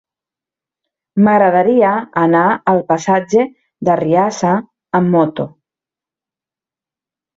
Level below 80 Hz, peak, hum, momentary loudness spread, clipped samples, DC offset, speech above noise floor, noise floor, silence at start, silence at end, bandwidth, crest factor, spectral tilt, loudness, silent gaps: -58 dBFS; -2 dBFS; none; 9 LU; under 0.1%; under 0.1%; 76 dB; -89 dBFS; 1.15 s; 1.9 s; 7.8 kHz; 14 dB; -7 dB/octave; -14 LUFS; none